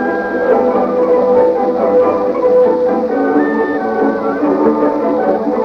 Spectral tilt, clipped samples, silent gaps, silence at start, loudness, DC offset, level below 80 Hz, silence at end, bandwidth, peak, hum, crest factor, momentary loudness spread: -8.5 dB/octave; under 0.1%; none; 0 s; -13 LUFS; under 0.1%; -50 dBFS; 0 s; 6 kHz; -2 dBFS; none; 12 dB; 4 LU